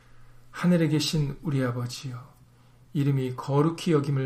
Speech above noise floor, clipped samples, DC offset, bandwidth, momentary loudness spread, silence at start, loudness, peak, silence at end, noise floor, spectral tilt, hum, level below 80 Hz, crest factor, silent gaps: 30 dB; under 0.1%; under 0.1%; 15.5 kHz; 13 LU; 0.15 s; -26 LUFS; -10 dBFS; 0 s; -55 dBFS; -6.5 dB/octave; none; -52 dBFS; 16 dB; none